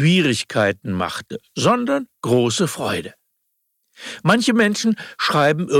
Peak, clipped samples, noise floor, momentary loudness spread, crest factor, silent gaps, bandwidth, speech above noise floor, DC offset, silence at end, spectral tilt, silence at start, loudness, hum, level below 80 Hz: -2 dBFS; under 0.1%; -71 dBFS; 12 LU; 16 dB; none; 16 kHz; 53 dB; under 0.1%; 0 s; -5 dB/octave; 0 s; -19 LUFS; none; -60 dBFS